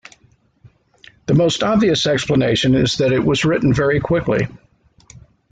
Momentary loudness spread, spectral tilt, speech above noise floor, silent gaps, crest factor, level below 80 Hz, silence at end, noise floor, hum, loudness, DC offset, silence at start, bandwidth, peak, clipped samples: 4 LU; -5.5 dB/octave; 40 dB; none; 12 dB; -42 dBFS; 0.95 s; -56 dBFS; none; -16 LUFS; under 0.1%; 1.3 s; 9.4 kHz; -4 dBFS; under 0.1%